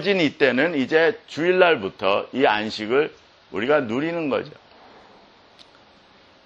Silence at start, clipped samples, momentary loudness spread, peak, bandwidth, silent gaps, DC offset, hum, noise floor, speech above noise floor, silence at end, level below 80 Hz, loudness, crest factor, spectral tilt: 0 s; under 0.1%; 9 LU; -2 dBFS; 8.2 kHz; none; under 0.1%; none; -53 dBFS; 32 dB; 1.95 s; -66 dBFS; -21 LUFS; 22 dB; -5.5 dB/octave